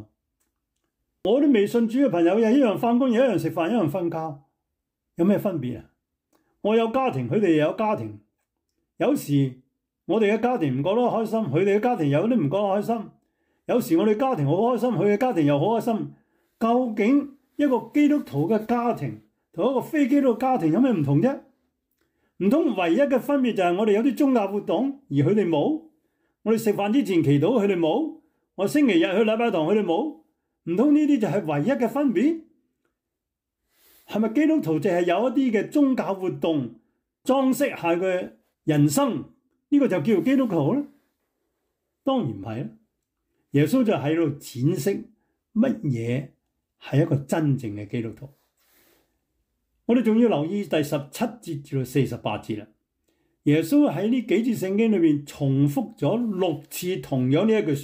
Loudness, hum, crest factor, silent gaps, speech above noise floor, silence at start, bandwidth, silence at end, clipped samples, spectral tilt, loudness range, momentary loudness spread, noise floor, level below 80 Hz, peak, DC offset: -23 LUFS; none; 14 dB; none; 62 dB; 0 s; 16 kHz; 0 s; under 0.1%; -7 dB/octave; 4 LU; 10 LU; -84 dBFS; -66 dBFS; -8 dBFS; under 0.1%